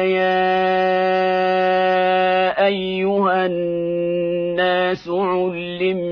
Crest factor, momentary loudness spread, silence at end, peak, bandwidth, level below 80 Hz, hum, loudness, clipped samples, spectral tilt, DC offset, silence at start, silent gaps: 12 dB; 5 LU; 0 s; -6 dBFS; 5.4 kHz; -56 dBFS; none; -18 LUFS; under 0.1%; -7.5 dB/octave; under 0.1%; 0 s; none